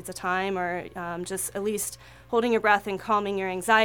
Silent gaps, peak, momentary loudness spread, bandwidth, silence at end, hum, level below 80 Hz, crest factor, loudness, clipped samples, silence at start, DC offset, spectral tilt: none; -6 dBFS; 11 LU; 19 kHz; 0 s; none; -58 dBFS; 20 dB; -27 LUFS; under 0.1%; 0 s; under 0.1%; -3.5 dB/octave